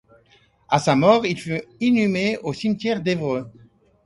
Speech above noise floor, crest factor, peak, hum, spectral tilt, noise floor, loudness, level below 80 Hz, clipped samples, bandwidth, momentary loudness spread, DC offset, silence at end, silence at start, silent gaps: 37 dB; 20 dB; -2 dBFS; none; -6 dB/octave; -58 dBFS; -21 LUFS; -58 dBFS; under 0.1%; 11.5 kHz; 10 LU; under 0.1%; 0.55 s; 0.7 s; none